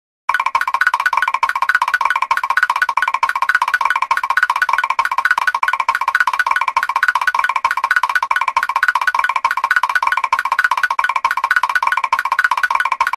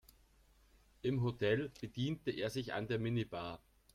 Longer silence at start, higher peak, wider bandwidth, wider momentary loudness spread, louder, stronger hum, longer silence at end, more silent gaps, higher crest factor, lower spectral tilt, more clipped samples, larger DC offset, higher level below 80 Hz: second, 0.3 s vs 1.05 s; first, 0 dBFS vs -22 dBFS; second, 13.5 kHz vs 15 kHz; second, 2 LU vs 9 LU; first, -15 LUFS vs -39 LUFS; neither; second, 0.05 s vs 0.35 s; neither; about the same, 16 dB vs 18 dB; second, 1.5 dB/octave vs -6.5 dB/octave; neither; neither; first, -60 dBFS vs -66 dBFS